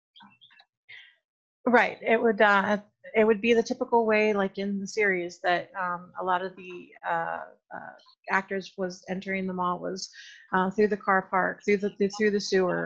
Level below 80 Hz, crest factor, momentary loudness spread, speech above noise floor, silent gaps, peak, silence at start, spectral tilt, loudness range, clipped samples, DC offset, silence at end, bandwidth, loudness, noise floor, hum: -68 dBFS; 20 dB; 15 LU; 32 dB; 1.25-1.64 s; -6 dBFS; 0.9 s; -5 dB/octave; 8 LU; under 0.1%; under 0.1%; 0 s; 8 kHz; -26 LUFS; -58 dBFS; none